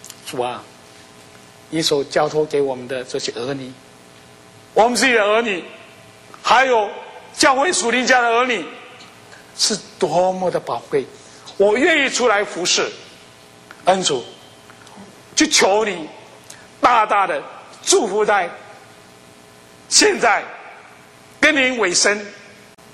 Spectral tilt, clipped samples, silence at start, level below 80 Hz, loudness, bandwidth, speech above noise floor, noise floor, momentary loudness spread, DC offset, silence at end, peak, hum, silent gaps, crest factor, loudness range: -2 dB/octave; under 0.1%; 0.25 s; -58 dBFS; -17 LUFS; 16 kHz; 28 dB; -45 dBFS; 20 LU; under 0.1%; 0.5 s; 0 dBFS; none; none; 20 dB; 5 LU